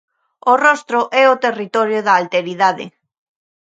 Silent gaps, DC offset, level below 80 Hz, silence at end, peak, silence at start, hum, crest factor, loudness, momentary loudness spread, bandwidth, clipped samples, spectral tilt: none; under 0.1%; -72 dBFS; 0.8 s; 0 dBFS; 0.45 s; none; 16 dB; -15 LUFS; 8 LU; 9 kHz; under 0.1%; -4 dB/octave